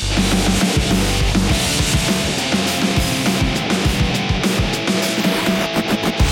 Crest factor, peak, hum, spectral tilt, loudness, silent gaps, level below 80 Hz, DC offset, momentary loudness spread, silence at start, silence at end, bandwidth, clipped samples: 14 dB; -4 dBFS; none; -4 dB/octave; -17 LUFS; none; -26 dBFS; under 0.1%; 2 LU; 0 s; 0 s; 17 kHz; under 0.1%